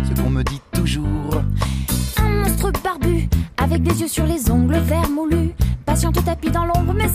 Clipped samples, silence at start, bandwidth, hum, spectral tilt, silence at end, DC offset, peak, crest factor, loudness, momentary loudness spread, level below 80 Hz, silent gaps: under 0.1%; 0 s; 15.5 kHz; none; -6 dB/octave; 0 s; under 0.1%; -4 dBFS; 14 dB; -19 LUFS; 4 LU; -24 dBFS; none